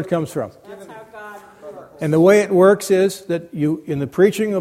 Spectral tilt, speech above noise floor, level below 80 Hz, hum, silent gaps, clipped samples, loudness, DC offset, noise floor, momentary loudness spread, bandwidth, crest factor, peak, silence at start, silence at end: -6.5 dB/octave; 22 dB; -60 dBFS; none; none; under 0.1%; -17 LUFS; under 0.1%; -38 dBFS; 25 LU; 15.5 kHz; 18 dB; 0 dBFS; 0 s; 0 s